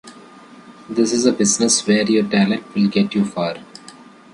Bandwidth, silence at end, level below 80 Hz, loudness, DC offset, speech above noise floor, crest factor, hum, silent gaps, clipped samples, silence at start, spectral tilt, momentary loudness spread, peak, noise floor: 11.5 kHz; 0.45 s; -60 dBFS; -17 LUFS; under 0.1%; 25 dB; 16 dB; none; none; under 0.1%; 0.05 s; -4 dB/octave; 10 LU; -2 dBFS; -42 dBFS